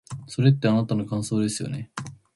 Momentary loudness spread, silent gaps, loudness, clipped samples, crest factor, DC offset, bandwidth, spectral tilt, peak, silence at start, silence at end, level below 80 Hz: 14 LU; none; -24 LUFS; under 0.1%; 18 dB; under 0.1%; 11.5 kHz; -6.5 dB/octave; -6 dBFS; 0.1 s; 0.2 s; -58 dBFS